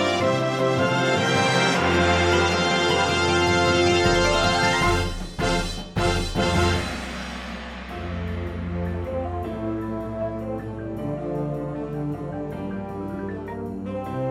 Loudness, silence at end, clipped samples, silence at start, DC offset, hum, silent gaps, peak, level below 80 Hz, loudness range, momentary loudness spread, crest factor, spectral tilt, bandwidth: -23 LUFS; 0 s; under 0.1%; 0 s; under 0.1%; none; none; -6 dBFS; -38 dBFS; 11 LU; 13 LU; 16 dB; -4.5 dB/octave; 15 kHz